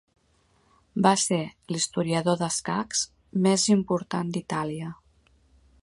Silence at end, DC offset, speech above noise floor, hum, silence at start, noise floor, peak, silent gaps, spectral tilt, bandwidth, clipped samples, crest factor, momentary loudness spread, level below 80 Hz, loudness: 0.9 s; under 0.1%; 40 dB; none; 0.95 s; -65 dBFS; -6 dBFS; none; -4.5 dB/octave; 11.5 kHz; under 0.1%; 22 dB; 11 LU; -62 dBFS; -26 LUFS